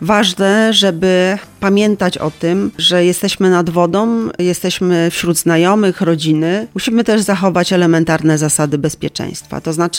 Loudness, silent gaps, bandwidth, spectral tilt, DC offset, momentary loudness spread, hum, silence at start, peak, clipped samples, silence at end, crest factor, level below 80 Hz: -13 LUFS; none; 17 kHz; -4.5 dB/octave; under 0.1%; 6 LU; none; 0 s; 0 dBFS; under 0.1%; 0 s; 12 dB; -48 dBFS